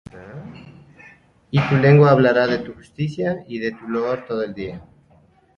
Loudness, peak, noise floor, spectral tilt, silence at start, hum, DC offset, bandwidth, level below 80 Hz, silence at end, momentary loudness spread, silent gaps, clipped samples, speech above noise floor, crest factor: -19 LUFS; -2 dBFS; -55 dBFS; -8.5 dB/octave; 0.15 s; none; under 0.1%; 6.8 kHz; -52 dBFS; 0.75 s; 25 LU; none; under 0.1%; 37 dB; 18 dB